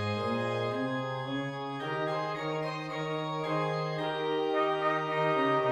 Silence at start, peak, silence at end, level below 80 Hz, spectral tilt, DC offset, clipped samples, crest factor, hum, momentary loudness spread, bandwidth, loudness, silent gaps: 0 s; -16 dBFS; 0 s; -72 dBFS; -6.5 dB/octave; under 0.1%; under 0.1%; 14 dB; none; 7 LU; 12 kHz; -32 LUFS; none